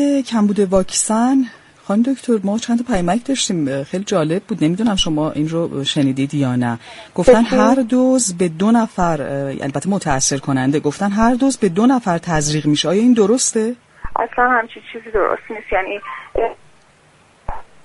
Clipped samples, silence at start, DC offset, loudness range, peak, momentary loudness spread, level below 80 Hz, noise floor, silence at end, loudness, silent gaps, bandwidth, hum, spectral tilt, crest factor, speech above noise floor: under 0.1%; 0 s; under 0.1%; 4 LU; 0 dBFS; 10 LU; -40 dBFS; -51 dBFS; 0.2 s; -17 LUFS; none; 11.5 kHz; none; -4.5 dB/octave; 16 dB; 35 dB